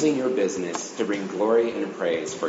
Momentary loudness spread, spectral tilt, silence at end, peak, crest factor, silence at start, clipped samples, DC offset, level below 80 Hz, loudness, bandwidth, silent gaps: 7 LU; -4.5 dB/octave; 0 s; -10 dBFS; 14 dB; 0 s; under 0.1%; under 0.1%; -70 dBFS; -25 LUFS; 8 kHz; none